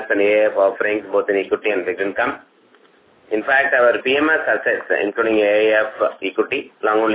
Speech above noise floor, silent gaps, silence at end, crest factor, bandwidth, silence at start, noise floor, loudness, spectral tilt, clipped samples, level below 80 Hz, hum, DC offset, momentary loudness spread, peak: 35 dB; none; 0 s; 16 dB; 4 kHz; 0 s; -53 dBFS; -18 LUFS; -7.5 dB/octave; under 0.1%; -62 dBFS; none; under 0.1%; 7 LU; -2 dBFS